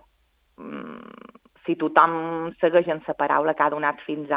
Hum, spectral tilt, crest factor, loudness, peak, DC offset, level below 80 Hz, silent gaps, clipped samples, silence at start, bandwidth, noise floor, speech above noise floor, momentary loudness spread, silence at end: none; -8.5 dB/octave; 24 dB; -22 LUFS; 0 dBFS; under 0.1%; -68 dBFS; none; under 0.1%; 0.6 s; 4.9 kHz; -66 dBFS; 44 dB; 19 LU; 0 s